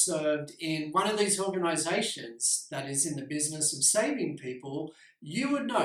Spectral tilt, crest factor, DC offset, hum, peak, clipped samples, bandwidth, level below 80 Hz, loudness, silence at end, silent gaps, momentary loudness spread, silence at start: -2.5 dB/octave; 20 dB; under 0.1%; none; -10 dBFS; under 0.1%; 16 kHz; -76 dBFS; -29 LUFS; 0 s; none; 13 LU; 0 s